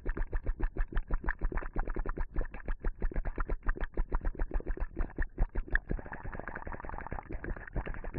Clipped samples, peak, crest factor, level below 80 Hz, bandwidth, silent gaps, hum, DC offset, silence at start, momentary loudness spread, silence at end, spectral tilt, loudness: under 0.1%; -12 dBFS; 22 dB; -36 dBFS; 3.6 kHz; none; none; under 0.1%; 0 s; 6 LU; 0 s; -10.5 dB/octave; -40 LUFS